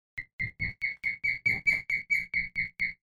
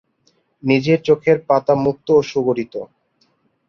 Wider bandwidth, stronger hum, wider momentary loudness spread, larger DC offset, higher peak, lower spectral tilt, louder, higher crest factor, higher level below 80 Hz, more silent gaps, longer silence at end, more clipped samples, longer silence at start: first, 14.5 kHz vs 6.8 kHz; neither; second, 8 LU vs 13 LU; neither; second, -16 dBFS vs -2 dBFS; second, -3.5 dB/octave vs -7 dB/octave; second, -29 LUFS vs -17 LUFS; about the same, 16 dB vs 16 dB; about the same, -54 dBFS vs -56 dBFS; first, 0.33-0.39 s vs none; second, 0.15 s vs 0.85 s; neither; second, 0.15 s vs 0.65 s